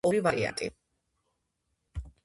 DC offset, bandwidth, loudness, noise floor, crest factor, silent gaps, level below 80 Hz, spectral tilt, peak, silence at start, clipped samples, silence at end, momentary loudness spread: under 0.1%; 12 kHz; -30 LUFS; -80 dBFS; 22 dB; none; -50 dBFS; -5 dB/octave; -12 dBFS; 0.05 s; under 0.1%; 0.15 s; 18 LU